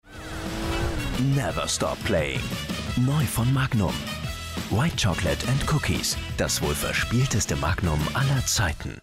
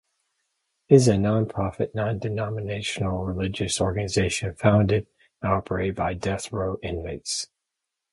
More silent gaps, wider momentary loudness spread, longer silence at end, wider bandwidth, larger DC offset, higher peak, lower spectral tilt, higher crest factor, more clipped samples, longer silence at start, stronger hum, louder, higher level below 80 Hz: neither; second, 7 LU vs 10 LU; second, 0.05 s vs 0.65 s; first, 16 kHz vs 11.5 kHz; neither; second, -14 dBFS vs -2 dBFS; about the same, -4.5 dB/octave vs -5.5 dB/octave; second, 12 dB vs 24 dB; neither; second, 0.05 s vs 0.9 s; neither; about the same, -25 LUFS vs -25 LUFS; first, -36 dBFS vs -44 dBFS